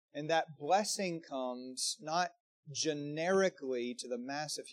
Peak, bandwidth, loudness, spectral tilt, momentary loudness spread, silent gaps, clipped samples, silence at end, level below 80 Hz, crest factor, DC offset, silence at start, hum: -18 dBFS; 14.5 kHz; -36 LUFS; -3 dB/octave; 8 LU; 2.40-2.63 s; under 0.1%; 0 s; under -90 dBFS; 18 dB; under 0.1%; 0.15 s; none